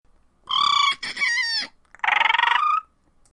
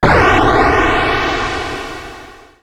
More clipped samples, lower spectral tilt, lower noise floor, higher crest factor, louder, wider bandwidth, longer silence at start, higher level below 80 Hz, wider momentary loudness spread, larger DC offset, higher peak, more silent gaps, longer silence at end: neither; second, 1.5 dB/octave vs -5.5 dB/octave; first, -56 dBFS vs -36 dBFS; about the same, 18 dB vs 14 dB; second, -20 LUFS vs -13 LUFS; second, 11.5 kHz vs 16 kHz; first, 0.5 s vs 0 s; second, -64 dBFS vs -26 dBFS; second, 9 LU vs 17 LU; neither; second, -4 dBFS vs 0 dBFS; neither; first, 0.5 s vs 0.3 s